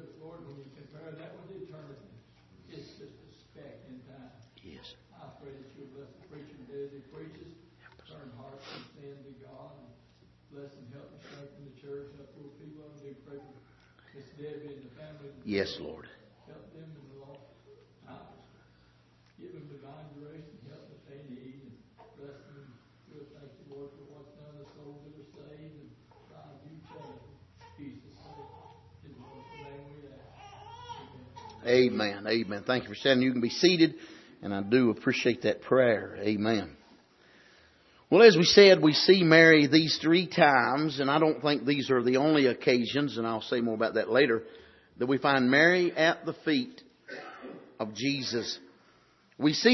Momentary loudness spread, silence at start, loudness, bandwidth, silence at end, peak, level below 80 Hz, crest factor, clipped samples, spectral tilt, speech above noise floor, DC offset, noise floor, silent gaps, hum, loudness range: 28 LU; 0.25 s; -25 LUFS; 6.2 kHz; 0 s; -4 dBFS; -70 dBFS; 26 dB; under 0.1%; -5 dB/octave; 38 dB; under 0.1%; -63 dBFS; none; none; 28 LU